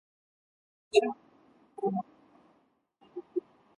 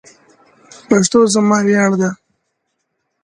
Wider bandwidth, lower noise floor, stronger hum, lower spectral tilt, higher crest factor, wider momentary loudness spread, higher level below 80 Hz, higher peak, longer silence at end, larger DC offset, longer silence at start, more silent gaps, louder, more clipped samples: about the same, 11 kHz vs 10.5 kHz; about the same, -70 dBFS vs -71 dBFS; neither; about the same, -5 dB/octave vs -5 dB/octave; first, 26 dB vs 16 dB; first, 20 LU vs 8 LU; second, -80 dBFS vs -58 dBFS; second, -10 dBFS vs 0 dBFS; second, 0.35 s vs 1.1 s; neither; about the same, 0.95 s vs 0.9 s; neither; second, -32 LUFS vs -13 LUFS; neither